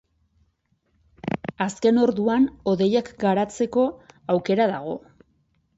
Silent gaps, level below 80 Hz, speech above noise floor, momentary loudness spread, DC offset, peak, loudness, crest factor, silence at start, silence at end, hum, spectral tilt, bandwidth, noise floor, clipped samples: none; -58 dBFS; 48 dB; 11 LU; under 0.1%; -8 dBFS; -23 LUFS; 16 dB; 1.25 s; 0.8 s; none; -6.5 dB/octave; 8 kHz; -69 dBFS; under 0.1%